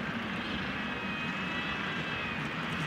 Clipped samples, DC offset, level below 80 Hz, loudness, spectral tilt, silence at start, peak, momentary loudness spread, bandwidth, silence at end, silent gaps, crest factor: under 0.1%; under 0.1%; -56 dBFS; -34 LUFS; -5 dB/octave; 0 s; -22 dBFS; 1 LU; 16 kHz; 0 s; none; 14 dB